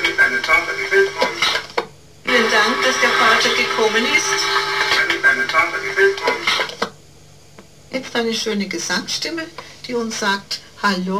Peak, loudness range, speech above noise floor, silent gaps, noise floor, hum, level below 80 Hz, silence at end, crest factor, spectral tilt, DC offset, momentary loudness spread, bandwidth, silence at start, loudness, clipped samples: -4 dBFS; 8 LU; 24 dB; none; -46 dBFS; none; -52 dBFS; 0 s; 14 dB; -2 dB/octave; 0.4%; 13 LU; 16 kHz; 0 s; -17 LUFS; under 0.1%